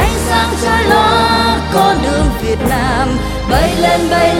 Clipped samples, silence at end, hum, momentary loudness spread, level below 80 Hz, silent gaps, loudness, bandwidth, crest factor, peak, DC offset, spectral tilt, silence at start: under 0.1%; 0 s; none; 5 LU; -22 dBFS; none; -12 LUFS; 17 kHz; 12 dB; 0 dBFS; under 0.1%; -4.5 dB/octave; 0 s